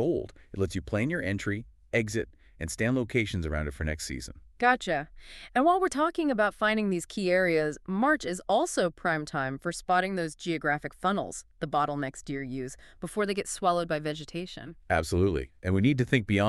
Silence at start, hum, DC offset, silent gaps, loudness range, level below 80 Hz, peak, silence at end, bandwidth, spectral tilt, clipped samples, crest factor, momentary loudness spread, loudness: 0 s; none; under 0.1%; none; 5 LU; -48 dBFS; -8 dBFS; 0 s; 13.5 kHz; -5.5 dB/octave; under 0.1%; 20 dB; 12 LU; -29 LUFS